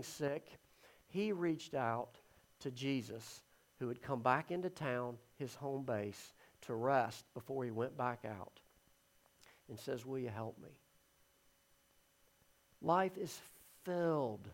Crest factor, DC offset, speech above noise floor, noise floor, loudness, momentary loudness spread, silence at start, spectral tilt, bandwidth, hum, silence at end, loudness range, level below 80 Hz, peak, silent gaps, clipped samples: 24 dB; under 0.1%; 33 dB; -73 dBFS; -41 LUFS; 16 LU; 0 s; -6 dB/octave; 16.5 kHz; none; 0 s; 9 LU; -80 dBFS; -18 dBFS; none; under 0.1%